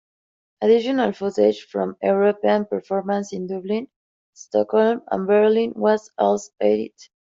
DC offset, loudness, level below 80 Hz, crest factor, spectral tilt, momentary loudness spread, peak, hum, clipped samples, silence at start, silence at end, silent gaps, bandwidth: under 0.1%; -21 LUFS; -68 dBFS; 16 dB; -6 dB/octave; 9 LU; -6 dBFS; none; under 0.1%; 0.6 s; 0.5 s; 3.96-4.33 s; 7.6 kHz